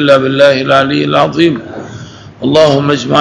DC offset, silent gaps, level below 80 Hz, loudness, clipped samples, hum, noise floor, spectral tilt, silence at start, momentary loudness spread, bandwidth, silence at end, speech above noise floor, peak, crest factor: under 0.1%; none; -48 dBFS; -9 LUFS; 2%; none; -29 dBFS; -6 dB/octave; 0 s; 18 LU; 11 kHz; 0 s; 20 dB; 0 dBFS; 10 dB